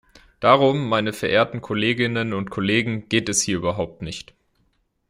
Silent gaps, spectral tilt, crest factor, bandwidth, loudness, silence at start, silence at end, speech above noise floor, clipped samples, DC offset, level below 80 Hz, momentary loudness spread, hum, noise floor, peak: none; -4 dB/octave; 20 dB; 16 kHz; -21 LUFS; 0.4 s; 0.85 s; 46 dB; under 0.1%; under 0.1%; -54 dBFS; 12 LU; none; -67 dBFS; -2 dBFS